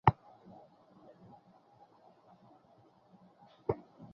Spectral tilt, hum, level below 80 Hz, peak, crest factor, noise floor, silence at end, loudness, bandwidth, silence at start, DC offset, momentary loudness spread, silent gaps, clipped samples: -6.5 dB/octave; none; -60 dBFS; -6 dBFS; 34 dB; -65 dBFS; 0.4 s; -38 LUFS; 6 kHz; 0.05 s; under 0.1%; 24 LU; none; under 0.1%